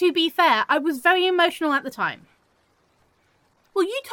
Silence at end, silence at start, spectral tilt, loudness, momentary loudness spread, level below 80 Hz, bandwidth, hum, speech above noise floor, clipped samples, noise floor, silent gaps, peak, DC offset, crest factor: 0 s; 0 s; -3 dB/octave; -21 LUFS; 9 LU; -74 dBFS; 17.5 kHz; none; 43 dB; under 0.1%; -64 dBFS; none; -4 dBFS; under 0.1%; 18 dB